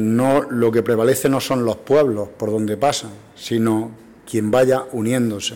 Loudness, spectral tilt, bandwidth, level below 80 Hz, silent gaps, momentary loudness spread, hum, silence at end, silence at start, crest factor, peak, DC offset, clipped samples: -19 LUFS; -5.5 dB/octave; 17 kHz; -56 dBFS; none; 8 LU; none; 0 s; 0 s; 12 dB; -6 dBFS; under 0.1%; under 0.1%